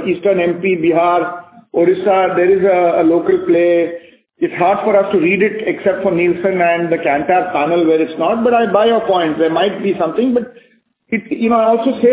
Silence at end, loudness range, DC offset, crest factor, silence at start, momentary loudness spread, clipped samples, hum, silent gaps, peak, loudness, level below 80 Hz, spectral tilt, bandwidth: 0 s; 2 LU; under 0.1%; 14 dB; 0 s; 7 LU; under 0.1%; none; none; 0 dBFS; -14 LUFS; -54 dBFS; -10 dB/octave; 4 kHz